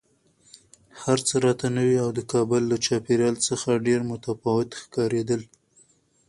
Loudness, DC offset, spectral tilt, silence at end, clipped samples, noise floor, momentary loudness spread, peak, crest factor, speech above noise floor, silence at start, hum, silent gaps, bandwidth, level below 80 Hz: -24 LUFS; under 0.1%; -5 dB/octave; 0.85 s; under 0.1%; -61 dBFS; 7 LU; -8 dBFS; 18 dB; 37 dB; 0.95 s; none; none; 11.5 kHz; -60 dBFS